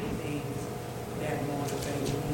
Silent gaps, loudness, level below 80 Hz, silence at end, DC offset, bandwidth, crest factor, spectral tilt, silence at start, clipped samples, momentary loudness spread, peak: none; -34 LUFS; -50 dBFS; 0 s; under 0.1%; 17 kHz; 14 dB; -5.5 dB/octave; 0 s; under 0.1%; 5 LU; -18 dBFS